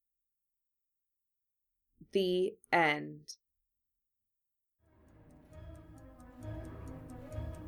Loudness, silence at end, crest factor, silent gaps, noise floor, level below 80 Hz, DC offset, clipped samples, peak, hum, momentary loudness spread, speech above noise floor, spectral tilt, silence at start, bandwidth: -34 LUFS; 0 s; 26 dB; none; -87 dBFS; -56 dBFS; under 0.1%; under 0.1%; -14 dBFS; none; 25 LU; 55 dB; -5.5 dB/octave; 2 s; 19 kHz